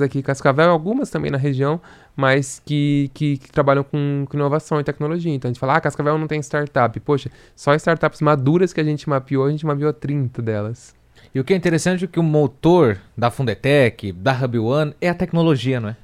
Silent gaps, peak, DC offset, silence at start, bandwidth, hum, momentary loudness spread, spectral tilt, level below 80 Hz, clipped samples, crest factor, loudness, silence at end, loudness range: none; 0 dBFS; under 0.1%; 0 s; 12.5 kHz; none; 7 LU; -7 dB/octave; -50 dBFS; under 0.1%; 18 dB; -19 LUFS; 0.1 s; 3 LU